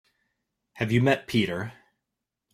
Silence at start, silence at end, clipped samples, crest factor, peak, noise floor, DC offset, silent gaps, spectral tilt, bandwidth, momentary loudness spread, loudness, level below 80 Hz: 0.75 s; 0.8 s; under 0.1%; 20 dB; -8 dBFS; -85 dBFS; under 0.1%; none; -6.5 dB/octave; 15.5 kHz; 12 LU; -25 LUFS; -60 dBFS